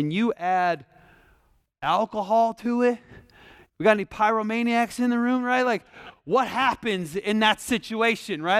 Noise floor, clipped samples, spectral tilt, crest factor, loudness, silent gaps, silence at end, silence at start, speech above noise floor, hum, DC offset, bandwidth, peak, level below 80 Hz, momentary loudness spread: -63 dBFS; under 0.1%; -4.5 dB/octave; 18 dB; -24 LUFS; none; 0 s; 0 s; 40 dB; none; under 0.1%; 15 kHz; -6 dBFS; -60 dBFS; 6 LU